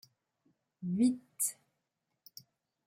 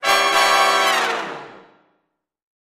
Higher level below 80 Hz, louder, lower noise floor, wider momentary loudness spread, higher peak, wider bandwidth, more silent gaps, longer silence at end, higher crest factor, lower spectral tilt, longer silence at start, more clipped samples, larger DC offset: second, -82 dBFS vs -66 dBFS; second, -34 LUFS vs -16 LUFS; first, -85 dBFS vs -72 dBFS; first, 23 LU vs 15 LU; second, -18 dBFS vs -2 dBFS; about the same, 16.5 kHz vs 15.5 kHz; neither; first, 1.35 s vs 1.1 s; about the same, 20 dB vs 18 dB; first, -5 dB/octave vs 0 dB/octave; first, 0.8 s vs 0 s; neither; neither